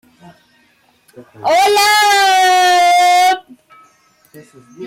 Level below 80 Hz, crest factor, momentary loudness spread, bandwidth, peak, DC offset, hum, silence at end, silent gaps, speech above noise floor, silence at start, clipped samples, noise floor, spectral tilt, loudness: -62 dBFS; 10 dB; 6 LU; 16.5 kHz; -4 dBFS; under 0.1%; none; 0 s; none; 40 dB; 1.2 s; under 0.1%; -54 dBFS; 0 dB/octave; -11 LUFS